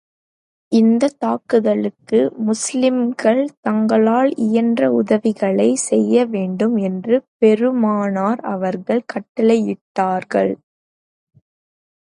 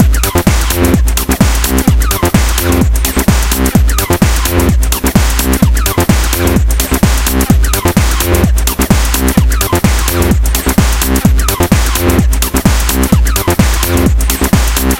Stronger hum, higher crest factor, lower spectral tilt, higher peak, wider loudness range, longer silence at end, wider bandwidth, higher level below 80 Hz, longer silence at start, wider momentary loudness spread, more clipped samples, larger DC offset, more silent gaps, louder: neither; first, 16 dB vs 10 dB; first, -6 dB/octave vs -4.5 dB/octave; about the same, -2 dBFS vs 0 dBFS; first, 4 LU vs 0 LU; first, 1.6 s vs 0 s; second, 11.5 kHz vs 17.5 kHz; second, -68 dBFS vs -12 dBFS; first, 0.7 s vs 0 s; first, 6 LU vs 1 LU; second, under 0.1% vs 0.4%; second, under 0.1% vs 0.2%; first, 3.57-3.63 s, 7.28-7.40 s, 9.29-9.35 s, 9.81-9.95 s vs none; second, -17 LUFS vs -11 LUFS